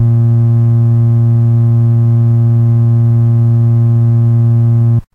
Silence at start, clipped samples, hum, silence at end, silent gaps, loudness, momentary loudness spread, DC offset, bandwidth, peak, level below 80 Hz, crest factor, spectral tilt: 0 s; under 0.1%; none; 0.1 s; none; -10 LUFS; 0 LU; under 0.1%; 1.7 kHz; -4 dBFS; -40 dBFS; 6 dB; -12 dB/octave